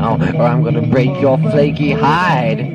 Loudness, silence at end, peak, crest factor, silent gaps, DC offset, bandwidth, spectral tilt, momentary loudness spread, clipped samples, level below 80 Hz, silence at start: -13 LUFS; 0 s; -2 dBFS; 12 dB; none; under 0.1%; 7.2 kHz; -8.5 dB/octave; 2 LU; under 0.1%; -40 dBFS; 0 s